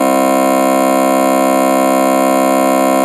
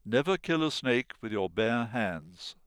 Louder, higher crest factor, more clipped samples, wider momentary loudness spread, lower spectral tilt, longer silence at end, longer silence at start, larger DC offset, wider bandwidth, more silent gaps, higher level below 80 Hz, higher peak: first, -11 LUFS vs -30 LUFS; second, 10 dB vs 16 dB; neither; second, 0 LU vs 8 LU; about the same, -4.5 dB/octave vs -5.5 dB/octave; second, 0 s vs 0.15 s; about the same, 0 s vs 0.05 s; neither; about the same, 13.5 kHz vs 13 kHz; neither; about the same, -64 dBFS vs -62 dBFS; first, 0 dBFS vs -14 dBFS